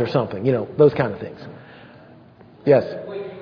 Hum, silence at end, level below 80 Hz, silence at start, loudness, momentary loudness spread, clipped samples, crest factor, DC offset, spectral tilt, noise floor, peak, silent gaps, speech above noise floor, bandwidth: none; 0 s; -58 dBFS; 0 s; -20 LUFS; 21 LU; under 0.1%; 18 dB; under 0.1%; -9.5 dB/octave; -47 dBFS; -2 dBFS; none; 28 dB; 5.4 kHz